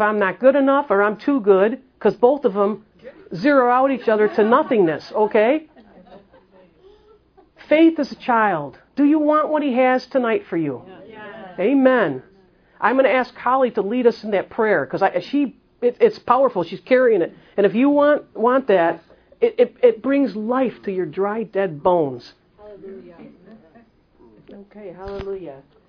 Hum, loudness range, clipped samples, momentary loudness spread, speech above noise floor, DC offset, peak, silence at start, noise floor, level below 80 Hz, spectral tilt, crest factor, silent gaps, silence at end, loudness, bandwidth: none; 6 LU; under 0.1%; 15 LU; 35 dB; under 0.1%; 0 dBFS; 0 s; -54 dBFS; -58 dBFS; -8 dB/octave; 18 dB; none; 0.3 s; -18 LUFS; 5.4 kHz